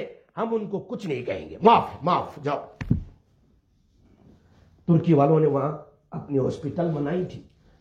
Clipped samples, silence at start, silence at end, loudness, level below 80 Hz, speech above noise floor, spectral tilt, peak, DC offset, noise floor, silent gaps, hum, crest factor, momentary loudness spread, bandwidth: under 0.1%; 0 s; 0.4 s; -24 LUFS; -50 dBFS; 39 dB; -8.5 dB/octave; -2 dBFS; under 0.1%; -62 dBFS; none; none; 22 dB; 17 LU; 7.4 kHz